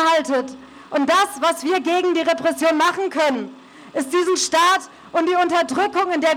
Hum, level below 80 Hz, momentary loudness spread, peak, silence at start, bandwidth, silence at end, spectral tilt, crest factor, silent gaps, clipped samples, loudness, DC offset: none; -64 dBFS; 9 LU; -6 dBFS; 0 s; 19 kHz; 0 s; -2 dB/octave; 12 dB; none; under 0.1%; -19 LUFS; under 0.1%